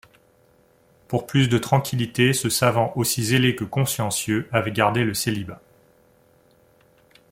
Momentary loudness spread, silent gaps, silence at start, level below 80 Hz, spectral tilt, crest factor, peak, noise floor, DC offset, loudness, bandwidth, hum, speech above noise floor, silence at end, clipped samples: 6 LU; none; 1.1 s; -56 dBFS; -4.5 dB/octave; 20 dB; -4 dBFS; -58 dBFS; under 0.1%; -22 LUFS; 16.5 kHz; none; 37 dB; 1.75 s; under 0.1%